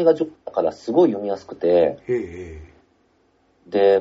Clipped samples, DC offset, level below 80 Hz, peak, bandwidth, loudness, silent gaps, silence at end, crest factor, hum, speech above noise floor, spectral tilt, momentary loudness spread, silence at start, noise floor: under 0.1%; under 0.1%; -52 dBFS; -4 dBFS; 7.6 kHz; -21 LUFS; none; 0 s; 16 dB; none; 42 dB; -6 dB/octave; 16 LU; 0 s; -62 dBFS